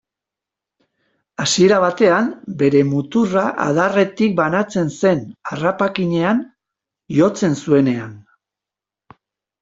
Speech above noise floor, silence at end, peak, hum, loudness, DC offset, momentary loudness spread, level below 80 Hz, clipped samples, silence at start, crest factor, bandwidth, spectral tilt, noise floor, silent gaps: 71 dB; 1.4 s; -2 dBFS; none; -17 LUFS; under 0.1%; 9 LU; -58 dBFS; under 0.1%; 1.4 s; 16 dB; 8.2 kHz; -5.5 dB/octave; -87 dBFS; none